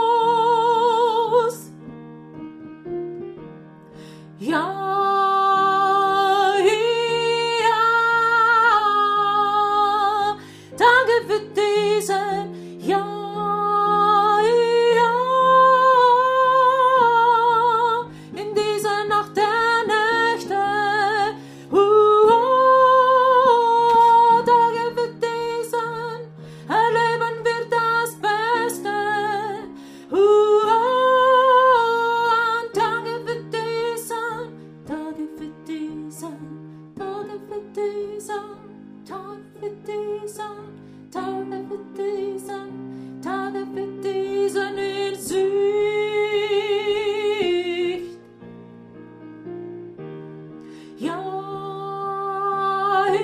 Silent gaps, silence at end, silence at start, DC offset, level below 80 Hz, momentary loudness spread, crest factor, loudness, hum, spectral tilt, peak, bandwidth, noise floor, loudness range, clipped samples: none; 0 s; 0 s; under 0.1%; -62 dBFS; 20 LU; 16 dB; -19 LUFS; none; -4 dB/octave; -4 dBFS; 15.5 kHz; -42 dBFS; 16 LU; under 0.1%